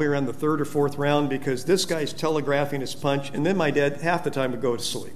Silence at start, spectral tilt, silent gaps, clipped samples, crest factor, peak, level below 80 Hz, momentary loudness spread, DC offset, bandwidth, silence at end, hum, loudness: 0 s; -5 dB/octave; none; under 0.1%; 16 dB; -6 dBFS; -58 dBFS; 4 LU; 2%; 15.5 kHz; 0 s; none; -25 LUFS